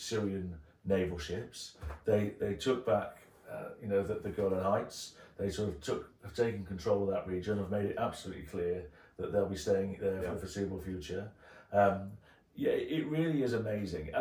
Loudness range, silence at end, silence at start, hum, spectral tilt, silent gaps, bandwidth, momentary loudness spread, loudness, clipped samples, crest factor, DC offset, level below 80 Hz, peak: 2 LU; 0 s; 0 s; none; -6 dB/octave; none; 17.5 kHz; 13 LU; -35 LUFS; under 0.1%; 18 dB; under 0.1%; -58 dBFS; -16 dBFS